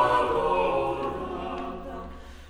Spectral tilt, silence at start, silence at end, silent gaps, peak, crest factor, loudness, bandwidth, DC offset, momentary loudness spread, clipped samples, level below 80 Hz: -6 dB/octave; 0 s; 0 s; none; -10 dBFS; 18 dB; -27 LUFS; 14 kHz; under 0.1%; 15 LU; under 0.1%; -44 dBFS